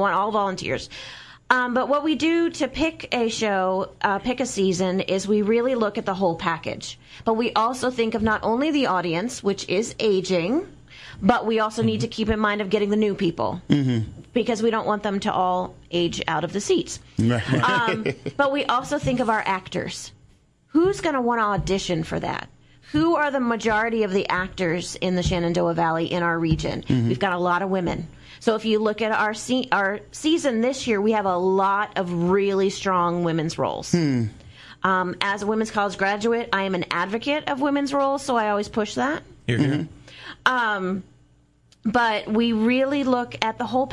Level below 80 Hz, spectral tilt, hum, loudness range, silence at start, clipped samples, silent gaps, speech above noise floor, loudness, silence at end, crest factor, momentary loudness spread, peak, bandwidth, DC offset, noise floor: -48 dBFS; -5.5 dB/octave; none; 2 LU; 0 s; under 0.1%; none; 35 dB; -23 LUFS; 0 s; 22 dB; 7 LU; 0 dBFS; 12 kHz; under 0.1%; -58 dBFS